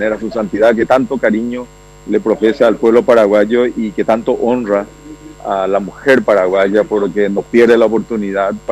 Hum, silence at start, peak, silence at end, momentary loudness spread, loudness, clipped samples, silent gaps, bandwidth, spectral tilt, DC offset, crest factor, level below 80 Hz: none; 0 s; 0 dBFS; 0 s; 9 LU; -13 LUFS; under 0.1%; none; 13 kHz; -6.5 dB/octave; under 0.1%; 12 dB; -44 dBFS